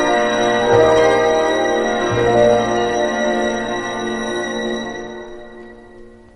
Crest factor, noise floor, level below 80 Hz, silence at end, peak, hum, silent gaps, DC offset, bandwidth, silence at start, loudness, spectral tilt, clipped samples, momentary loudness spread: 16 dB; -40 dBFS; -42 dBFS; 0.2 s; -2 dBFS; none; none; under 0.1%; 10.5 kHz; 0 s; -16 LUFS; -4.5 dB/octave; under 0.1%; 16 LU